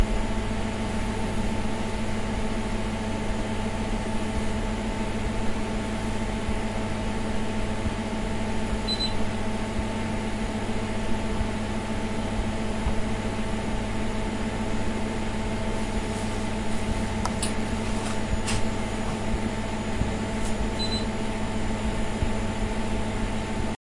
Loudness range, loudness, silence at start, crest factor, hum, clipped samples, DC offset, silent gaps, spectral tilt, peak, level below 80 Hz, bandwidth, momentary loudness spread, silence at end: 1 LU; -29 LUFS; 0 s; 18 dB; none; under 0.1%; under 0.1%; none; -5.5 dB/octave; -8 dBFS; -32 dBFS; 11.5 kHz; 2 LU; 0.25 s